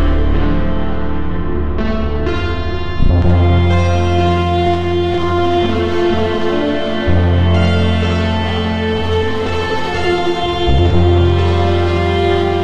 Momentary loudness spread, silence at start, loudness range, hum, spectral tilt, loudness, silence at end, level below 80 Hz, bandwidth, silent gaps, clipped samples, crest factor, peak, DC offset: 7 LU; 0 s; 2 LU; none; -7.5 dB/octave; -15 LUFS; 0 s; -22 dBFS; 7.4 kHz; none; under 0.1%; 12 dB; -2 dBFS; 6%